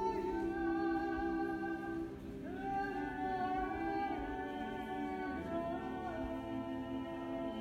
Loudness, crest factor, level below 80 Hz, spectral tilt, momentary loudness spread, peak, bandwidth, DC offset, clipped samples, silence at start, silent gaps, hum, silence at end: -40 LUFS; 14 dB; -56 dBFS; -7 dB/octave; 5 LU; -26 dBFS; 13.5 kHz; under 0.1%; under 0.1%; 0 s; none; none; 0 s